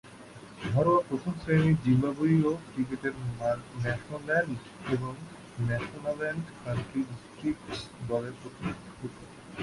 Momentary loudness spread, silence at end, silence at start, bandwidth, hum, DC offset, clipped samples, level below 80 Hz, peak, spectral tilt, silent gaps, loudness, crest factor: 17 LU; 0 s; 0.05 s; 11.5 kHz; none; under 0.1%; under 0.1%; -56 dBFS; -14 dBFS; -7.5 dB/octave; none; -30 LUFS; 18 dB